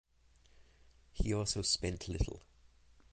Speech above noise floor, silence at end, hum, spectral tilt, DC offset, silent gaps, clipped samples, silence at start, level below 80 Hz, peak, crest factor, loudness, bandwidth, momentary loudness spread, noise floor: 30 dB; 0.7 s; none; -4 dB/octave; under 0.1%; none; under 0.1%; 0.6 s; -46 dBFS; -18 dBFS; 20 dB; -36 LUFS; 9.6 kHz; 8 LU; -67 dBFS